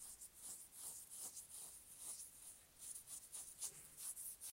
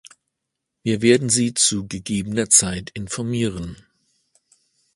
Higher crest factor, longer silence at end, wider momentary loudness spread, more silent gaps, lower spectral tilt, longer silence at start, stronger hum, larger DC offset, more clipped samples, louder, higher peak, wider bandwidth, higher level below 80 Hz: about the same, 24 dB vs 22 dB; second, 0 s vs 1.2 s; second, 6 LU vs 15 LU; neither; second, 0.5 dB/octave vs -3.5 dB/octave; second, 0 s vs 0.85 s; neither; neither; neither; second, -52 LUFS vs -19 LUFS; second, -32 dBFS vs 0 dBFS; first, 16 kHz vs 11.5 kHz; second, -80 dBFS vs -48 dBFS